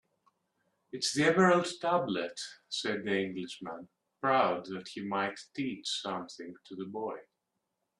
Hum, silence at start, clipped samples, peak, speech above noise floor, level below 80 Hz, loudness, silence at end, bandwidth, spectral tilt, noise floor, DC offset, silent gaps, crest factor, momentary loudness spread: none; 0.95 s; under 0.1%; -12 dBFS; 52 dB; -76 dBFS; -32 LUFS; 0.8 s; 12.5 kHz; -4 dB/octave; -84 dBFS; under 0.1%; none; 22 dB; 18 LU